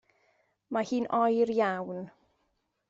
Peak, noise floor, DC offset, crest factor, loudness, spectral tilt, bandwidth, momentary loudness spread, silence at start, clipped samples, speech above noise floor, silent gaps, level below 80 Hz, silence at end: -14 dBFS; -77 dBFS; under 0.1%; 16 dB; -29 LUFS; -6 dB/octave; 7.8 kHz; 14 LU; 0.7 s; under 0.1%; 48 dB; none; -74 dBFS; 0.8 s